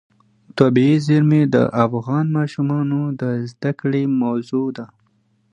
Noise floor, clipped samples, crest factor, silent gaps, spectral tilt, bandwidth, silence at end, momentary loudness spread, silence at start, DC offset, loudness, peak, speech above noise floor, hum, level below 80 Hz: -62 dBFS; under 0.1%; 18 dB; none; -8.5 dB/octave; 9.8 kHz; 0.65 s; 9 LU; 0.55 s; under 0.1%; -18 LUFS; 0 dBFS; 44 dB; none; -60 dBFS